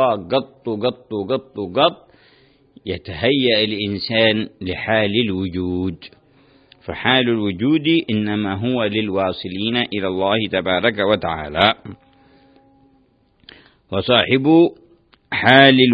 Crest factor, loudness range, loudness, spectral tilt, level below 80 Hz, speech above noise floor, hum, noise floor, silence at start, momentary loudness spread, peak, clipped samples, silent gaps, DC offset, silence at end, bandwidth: 18 dB; 3 LU; -18 LUFS; -8 dB/octave; -50 dBFS; 40 dB; none; -58 dBFS; 0 s; 12 LU; 0 dBFS; under 0.1%; none; under 0.1%; 0 s; 5.2 kHz